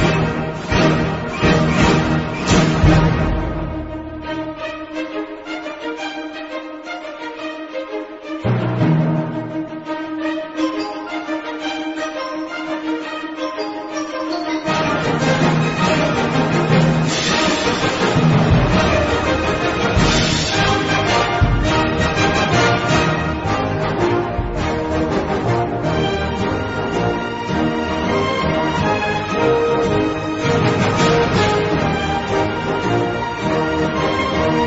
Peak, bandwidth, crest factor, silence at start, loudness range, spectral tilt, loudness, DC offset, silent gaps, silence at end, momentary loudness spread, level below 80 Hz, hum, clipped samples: -2 dBFS; 8 kHz; 16 dB; 0 s; 8 LU; -5.5 dB/octave; -18 LUFS; under 0.1%; none; 0 s; 12 LU; -32 dBFS; none; under 0.1%